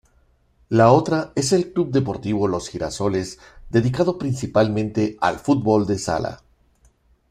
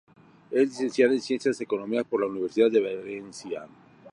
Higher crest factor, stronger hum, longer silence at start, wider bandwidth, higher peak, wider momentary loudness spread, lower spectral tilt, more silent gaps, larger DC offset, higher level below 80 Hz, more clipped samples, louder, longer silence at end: about the same, 20 dB vs 20 dB; neither; first, 0.7 s vs 0.5 s; first, 14.5 kHz vs 11 kHz; first, -2 dBFS vs -8 dBFS; second, 9 LU vs 14 LU; about the same, -6 dB/octave vs -5 dB/octave; neither; neither; first, -48 dBFS vs -76 dBFS; neither; first, -21 LUFS vs -26 LUFS; first, 0.95 s vs 0.05 s